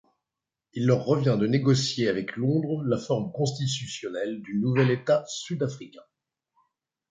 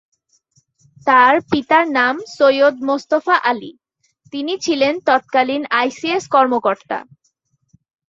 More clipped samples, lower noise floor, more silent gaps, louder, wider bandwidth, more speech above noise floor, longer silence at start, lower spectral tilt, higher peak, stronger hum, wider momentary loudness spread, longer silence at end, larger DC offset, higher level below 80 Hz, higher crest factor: neither; first, -88 dBFS vs -66 dBFS; neither; second, -26 LUFS vs -16 LUFS; first, 9.4 kHz vs 7.8 kHz; first, 63 dB vs 50 dB; second, 0.75 s vs 1.05 s; first, -6 dB/octave vs -3.5 dB/octave; second, -8 dBFS vs -2 dBFS; neither; about the same, 9 LU vs 11 LU; about the same, 1.1 s vs 1.05 s; neither; about the same, -64 dBFS vs -62 dBFS; about the same, 18 dB vs 16 dB